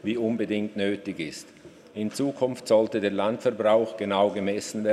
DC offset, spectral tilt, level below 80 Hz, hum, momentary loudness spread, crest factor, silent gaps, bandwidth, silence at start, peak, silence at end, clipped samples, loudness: under 0.1%; -5.5 dB/octave; -70 dBFS; none; 11 LU; 16 dB; none; 13.5 kHz; 0.05 s; -10 dBFS; 0 s; under 0.1%; -26 LUFS